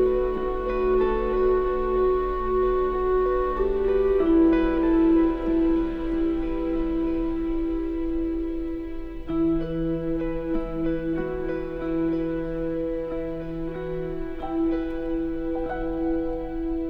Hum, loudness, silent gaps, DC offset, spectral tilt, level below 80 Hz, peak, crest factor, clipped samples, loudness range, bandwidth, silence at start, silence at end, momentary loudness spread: none; -25 LUFS; none; under 0.1%; -9.5 dB/octave; -34 dBFS; -12 dBFS; 12 dB; under 0.1%; 7 LU; 4.9 kHz; 0 s; 0 s; 10 LU